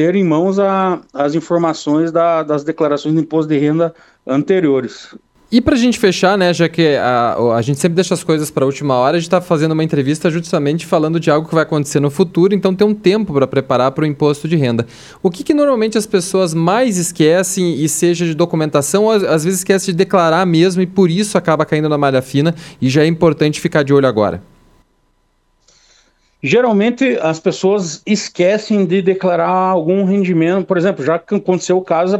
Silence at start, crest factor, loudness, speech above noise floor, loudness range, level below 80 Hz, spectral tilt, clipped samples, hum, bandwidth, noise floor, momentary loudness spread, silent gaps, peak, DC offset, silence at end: 0 s; 14 dB; -14 LUFS; 46 dB; 3 LU; -50 dBFS; -5.5 dB/octave; under 0.1%; none; 15.5 kHz; -59 dBFS; 5 LU; none; 0 dBFS; under 0.1%; 0 s